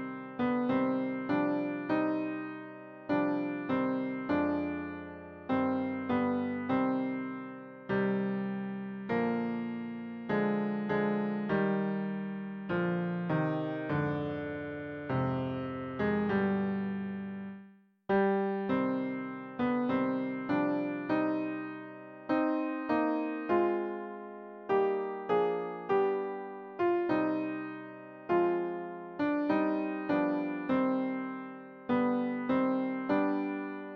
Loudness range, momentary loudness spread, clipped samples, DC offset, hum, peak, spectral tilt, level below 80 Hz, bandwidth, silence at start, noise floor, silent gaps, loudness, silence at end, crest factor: 2 LU; 11 LU; under 0.1%; under 0.1%; none; -16 dBFS; -9.5 dB/octave; -68 dBFS; 5.6 kHz; 0 s; -57 dBFS; none; -32 LUFS; 0 s; 16 dB